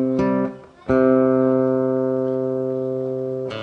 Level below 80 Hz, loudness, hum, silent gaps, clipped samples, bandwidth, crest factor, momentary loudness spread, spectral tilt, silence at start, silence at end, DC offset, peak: -52 dBFS; -20 LUFS; none; none; under 0.1%; 6.2 kHz; 16 dB; 9 LU; -9 dB/octave; 0 s; 0 s; under 0.1%; -4 dBFS